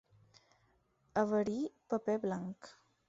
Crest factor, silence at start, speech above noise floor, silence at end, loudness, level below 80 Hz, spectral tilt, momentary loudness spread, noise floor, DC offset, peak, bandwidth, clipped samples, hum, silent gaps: 20 dB; 1.15 s; 38 dB; 0.35 s; -37 LUFS; -74 dBFS; -6.5 dB/octave; 15 LU; -74 dBFS; under 0.1%; -18 dBFS; 7.8 kHz; under 0.1%; none; none